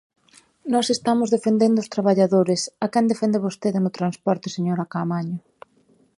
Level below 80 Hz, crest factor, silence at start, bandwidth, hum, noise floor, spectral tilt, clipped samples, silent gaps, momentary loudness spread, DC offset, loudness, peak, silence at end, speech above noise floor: -70 dBFS; 16 dB; 0.65 s; 11.5 kHz; none; -60 dBFS; -6 dB/octave; under 0.1%; none; 7 LU; under 0.1%; -22 LUFS; -6 dBFS; 0.8 s; 39 dB